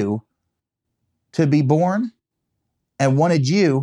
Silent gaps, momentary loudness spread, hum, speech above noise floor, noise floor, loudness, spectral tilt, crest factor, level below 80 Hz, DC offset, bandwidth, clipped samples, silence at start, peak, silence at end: none; 12 LU; none; 62 dB; -79 dBFS; -19 LUFS; -7 dB/octave; 18 dB; -72 dBFS; under 0.1%; 10.5 kHz; under 0.1%; 0 s; -2 dBFS; 0 s